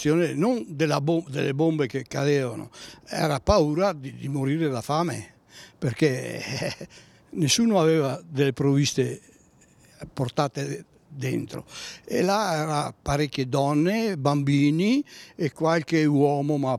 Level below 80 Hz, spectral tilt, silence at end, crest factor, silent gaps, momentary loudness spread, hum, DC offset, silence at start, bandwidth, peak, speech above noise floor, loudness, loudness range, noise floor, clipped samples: -48 dBFS; -5.5 dB/octave; 0 s; 20 dB; none; 15 LU; none; under 0.1%; 0 s; 14.5 kHz; -6 dBFS; 32 dB; -25 LUFS; 4 LU; -57 dBFS; under 0.1%